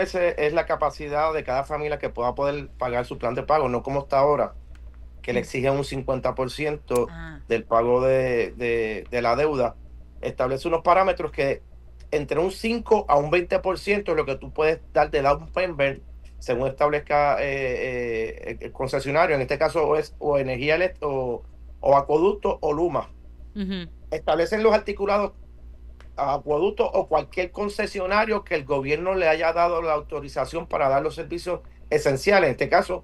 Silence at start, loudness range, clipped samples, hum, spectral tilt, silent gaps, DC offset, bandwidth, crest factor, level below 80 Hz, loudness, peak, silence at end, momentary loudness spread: 0 s; 2 LU; under 0.1%; none; -6 dB/octave; none; under 0.1%; 12.5 kHz; 18 dB; -42 dBFS; -24 LUFS; -6 dBFS; 0.05 s; 10 LU